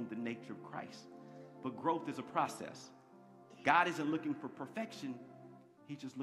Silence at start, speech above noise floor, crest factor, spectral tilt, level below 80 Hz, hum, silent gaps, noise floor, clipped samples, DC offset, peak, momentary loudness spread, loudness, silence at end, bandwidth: 0 s; 22 dB; 26 dB; -5 dB/octave; -86 dBFS; none; none; -60 dBFS; under 0.1%; under 0.1%; -14 dBFS; 23 LU; -39 LUFS; 0 s; 13.5 kHz